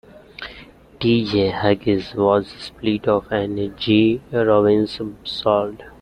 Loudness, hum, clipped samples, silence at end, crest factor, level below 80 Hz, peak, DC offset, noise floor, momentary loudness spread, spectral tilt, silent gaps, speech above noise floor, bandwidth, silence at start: -19 LUFS; none; under 0.1%; 0.1 s; 18 dB; -48 dBFS; -2 dBFS; under 0.1%; -44 dBFS; 13 LU; -7.5 dB/octave; none; 25 dB; 9.8 kHz; 0.15 s